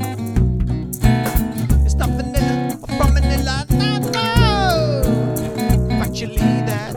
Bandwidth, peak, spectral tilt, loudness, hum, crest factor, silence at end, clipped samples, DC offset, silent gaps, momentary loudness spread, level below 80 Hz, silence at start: 19 kHz; 0 dBFS; -6 dB/octave; -18 LUFS; none; 16 dB; 0 s; under 0.1%; under 0.1%; none; 6 LU; -22 dBFS; 0 s